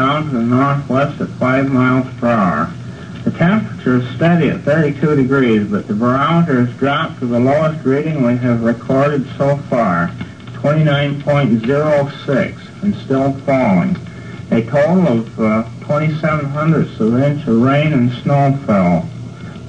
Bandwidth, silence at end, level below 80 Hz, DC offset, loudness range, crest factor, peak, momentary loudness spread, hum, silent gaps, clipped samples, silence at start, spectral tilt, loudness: 8.8 kHz; 0 s; -46 dBFS; 0.3%; 2 LU; 12 dB; -2 dBFS; 7 LU; none; none; under 0.1%; 0 s; -8.5 dB/octave; -15 LUFS